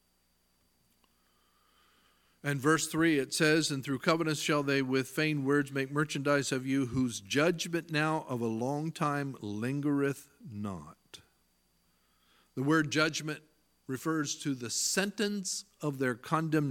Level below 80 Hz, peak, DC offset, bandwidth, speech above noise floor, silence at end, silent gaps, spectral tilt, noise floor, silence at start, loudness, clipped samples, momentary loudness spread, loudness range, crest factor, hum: -70 dBFS; -10 dBFS; under 0.1%; 17.5 kHz; 42 dB; 0 s; none; -4.5 dB/octave; -73 dBFS; 2.45 s; -31 LUFS; under 0.1%; 11 LU; 6 LU; 24 dB; 60 Hz at -65 dBFS